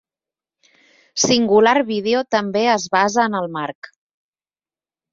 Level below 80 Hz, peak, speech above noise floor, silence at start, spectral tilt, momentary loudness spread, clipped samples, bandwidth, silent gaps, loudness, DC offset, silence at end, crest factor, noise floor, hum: -62 dBFS; -2 dBFS; over 73 dB; 1.15 s; -3 dB/octave; 14 LU; under 0.1%; 7.8 kHz; none; -17 LUFS; under 0.1%; 1.4 s; 18 dB; under -90 dBFS; none